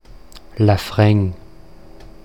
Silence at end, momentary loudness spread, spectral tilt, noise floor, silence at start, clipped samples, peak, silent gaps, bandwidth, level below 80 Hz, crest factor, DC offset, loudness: 0.15 s; 21 LU; -7.5 dB/octave; -43 dBFS; 0.35 s; under 0.1%; -2 dBFS; none; 15.5 kHz; -42 dBFS; 18 dB; 0.9%; -17 LUFS